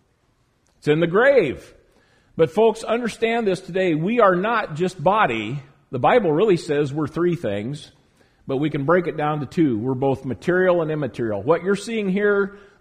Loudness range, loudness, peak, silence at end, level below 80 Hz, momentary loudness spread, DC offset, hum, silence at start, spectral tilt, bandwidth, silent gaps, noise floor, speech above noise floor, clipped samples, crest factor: 3 LU; -20 LUFS; -2 dBFS; 0.25 s; -54 dBFS; 10 LU; under 0.1%; none; 0.85 s; -6.5 dB/octave; 11 kHz; none; -64 dBFS; 44 dB; under 0.1%; 18 dB